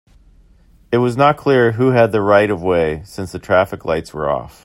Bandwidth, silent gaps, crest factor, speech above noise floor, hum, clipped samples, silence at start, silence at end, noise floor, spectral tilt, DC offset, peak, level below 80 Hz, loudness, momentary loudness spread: 16 kHz; none; 16 dB; 34 dB; none; under 0.1%; 0.9 s; 0.15 s; -49 dBFS; -7 dB/octave; under 0.1%; 0 dBFS; -46 dBFS; -16 LUFS; 9 LU